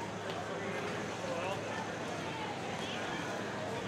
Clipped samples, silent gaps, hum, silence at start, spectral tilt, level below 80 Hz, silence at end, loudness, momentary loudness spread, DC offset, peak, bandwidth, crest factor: under 0.1%; none; none; 0 s; -4.5 dB/octave; -68 dBFS; 0 s; -38 LUFS; 2 LU; under 0.1%; -22 dBFS; 16 kHz; 16 dB